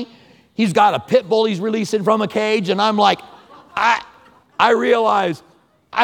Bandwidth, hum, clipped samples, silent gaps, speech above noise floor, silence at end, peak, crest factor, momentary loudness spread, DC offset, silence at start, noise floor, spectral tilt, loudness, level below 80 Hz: 15.5 kHz; none; under 0.1%; none; 33 dB; 0 s; 0 dBFS; 18 dB; 11 LU; under 0.1%; 0 s; -49 dBFS; -5 dB/octave; -17 LUFS; -62 dBFS